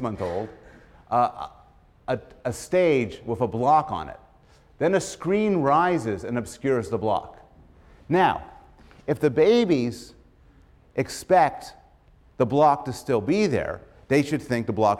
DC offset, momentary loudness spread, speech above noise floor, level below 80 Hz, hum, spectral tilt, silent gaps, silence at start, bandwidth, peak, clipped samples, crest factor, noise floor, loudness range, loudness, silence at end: under 0.1%; 13 LU; 33 dB; -54 dBFS; none; -6 dB/octave; none; 0 s; 15 kHz; -8 dBFS; under 0.1%; 16 dB; -55 dBFS; 3 LU; -24 LUFS; 0 s